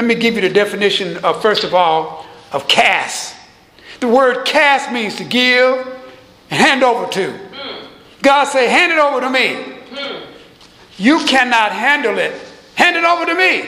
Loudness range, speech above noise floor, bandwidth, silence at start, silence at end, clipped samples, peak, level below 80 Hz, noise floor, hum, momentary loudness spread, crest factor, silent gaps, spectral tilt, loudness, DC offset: 2 LU; 29 dB; 16 kHz; 0 s; 0 s; under 0.1%; 0 dBFS; -58 dBFS; -43 dBFS; none; 17 LU; 14 dB; none; -3 dB/octave; -13 LUFS; under 0.1%